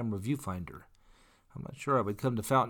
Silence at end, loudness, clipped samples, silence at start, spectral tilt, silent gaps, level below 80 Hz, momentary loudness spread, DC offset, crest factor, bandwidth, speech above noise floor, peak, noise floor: 0 s; -33 LUFS; under 0.1%; 0 s; -6.5 dB/octave; none; -60 dBFS; 18 LU; under 0.1%; 18 dB; 19 kHz; 30 dB; -14 dBFS; -62 dBFS